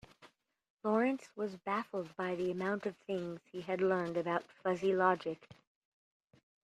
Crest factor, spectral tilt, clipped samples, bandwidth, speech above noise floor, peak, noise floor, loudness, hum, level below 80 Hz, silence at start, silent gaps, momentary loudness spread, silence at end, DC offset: 20 dB; -7 dB/octave; under 0.1%; 10 kHz; 29 dB; -16 dBFS; -65 dBFS; -36 LUFS; none; -78 dBFS; 0.2 s; 0.70-0.77 s; 10 LU; 1.1 s; under 0.1%